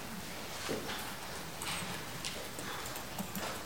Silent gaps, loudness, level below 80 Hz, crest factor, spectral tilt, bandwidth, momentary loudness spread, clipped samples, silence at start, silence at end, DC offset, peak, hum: none; -40 LUFS; -60 dBFS; 20 dB; -2.5 dB/octave; 17 kHz; 4 LU; under 0.1%; 0 s; 0 s; 0.3%; -22 dBFS; none